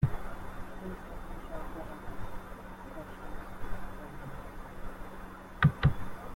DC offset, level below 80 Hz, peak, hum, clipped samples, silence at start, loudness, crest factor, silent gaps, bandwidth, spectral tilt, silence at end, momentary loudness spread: under 0.1%; -44 dBFS; -12 dBFS; none; under 0.1%; 0 s; -38 LUFS; 24 dB; none; 16.5 kHz; -7.5 dB/octave; 0 s; 18 LU